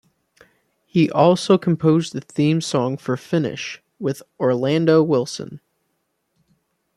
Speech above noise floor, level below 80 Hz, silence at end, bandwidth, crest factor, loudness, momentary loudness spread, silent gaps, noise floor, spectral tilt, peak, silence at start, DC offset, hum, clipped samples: 53 dB; -64 dBFS; 1.4 s; 12.5 kHz; 18 dB; -19 LUFS; 12 LU; none; -72 dBFS; -6.5 dB/octave; -2 dBFS; 0.95 s; under 0.1%; none; under 0.1%